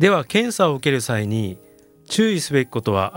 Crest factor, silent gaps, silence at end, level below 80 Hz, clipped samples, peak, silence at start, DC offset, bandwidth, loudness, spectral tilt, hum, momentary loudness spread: 18 dB; none; 0 s; -60 dBFS; under 0.1%; -2 dBFS; 0 s; under 0.1%; 17 kHz; -20 LUFS; -5 dB/octave; none; 7 LU